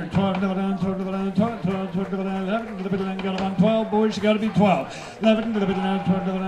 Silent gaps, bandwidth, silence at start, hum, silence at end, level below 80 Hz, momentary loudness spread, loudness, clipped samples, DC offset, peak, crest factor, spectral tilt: none; 9.6 kHz; 0 s; none; 0 s; -52 dBFS; 7 LU; -23 LUFS; under 0.1%; under 0.1%; -6 dBFS; 16 dB; -7.5 dB/octave